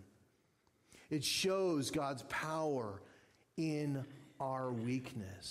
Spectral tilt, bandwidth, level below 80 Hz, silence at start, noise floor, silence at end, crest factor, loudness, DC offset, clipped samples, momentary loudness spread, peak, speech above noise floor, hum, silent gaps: -4.5 dB/octave; 16 kHz; -72 dBFS; 0 s; -75 dBFS; 0 s; 14 dB; -39 LUFS; under 0.1%; under 0.1%; 13 LU; -26 dBFS; 36 dB; none; none